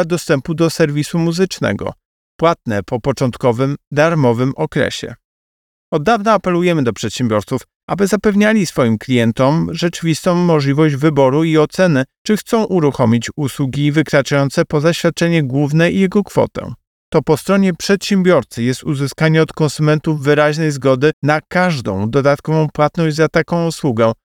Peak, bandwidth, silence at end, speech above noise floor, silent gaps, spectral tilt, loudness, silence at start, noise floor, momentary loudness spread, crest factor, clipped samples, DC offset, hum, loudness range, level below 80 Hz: 0 dBFS; 17.5 kHz; 0.1 s; over 76 dB; 2.05-2.39 s, 3.87-3.91 s, 5.25-5.92 s, 7.76-7.88 s, 12.18-12.25 s, 16.87-17.12 s, 21.13-21.22 s; -6 dB/octave; -15 LUFS; 0 s; under -90 dBFS; 6 LU; 14 dB; under 0.1%; under 0.1%; none; 3 LU; -46 dBFS